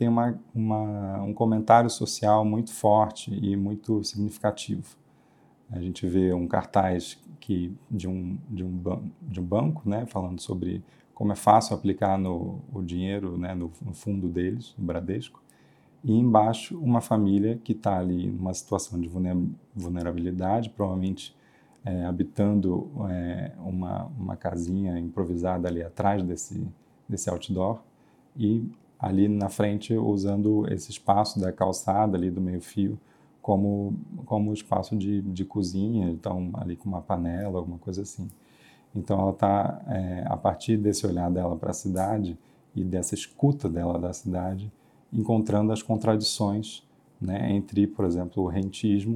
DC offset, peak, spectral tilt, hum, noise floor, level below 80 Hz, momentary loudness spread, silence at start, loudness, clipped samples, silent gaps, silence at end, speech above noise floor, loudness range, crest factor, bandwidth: under 0.1%; -4 dBFS; -6.5 dB/octave; none; -59 dBFS; -60 dBFS; 11 LU; 0 s; -27 LUFS; under 0.1%; none; 0 s; 33 dB; 5 LU; 24 dB; 14.5 kHz